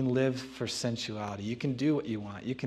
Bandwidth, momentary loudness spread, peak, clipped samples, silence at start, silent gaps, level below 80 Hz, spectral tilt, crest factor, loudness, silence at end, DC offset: 13.5 kHz; 8 LU; -16 dBFS; under 0.1%; 0 s; none; -66 dBFS; -5.5 dB/octave; 16 dB; -33 LUFS; 0 s; under 0.1%